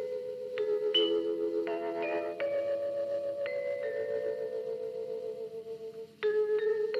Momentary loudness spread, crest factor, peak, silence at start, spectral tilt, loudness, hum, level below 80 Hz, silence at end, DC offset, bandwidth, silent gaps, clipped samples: 11 LU; 16 dB; -18 dBFS; 0 s; -4.5 dB/octave; -33 LUFS; none; -86 dBFS; 0 s; under 0.1%; 7.6 kHz; none; under 0.1%